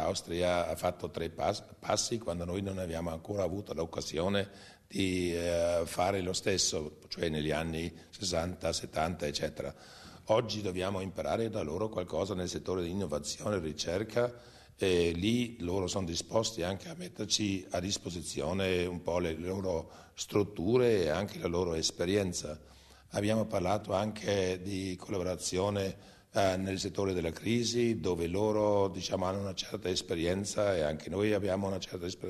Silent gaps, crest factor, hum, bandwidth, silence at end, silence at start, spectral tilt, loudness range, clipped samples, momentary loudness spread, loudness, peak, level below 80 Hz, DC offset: none; 18 dB; none; 13 kHz; 0 s; 0 s; -4.5 dB/octave; 3 LU; under 0.1%; 8 LU; -33 LUFS; -14 dBFS; -56 dBFS; under 0.1%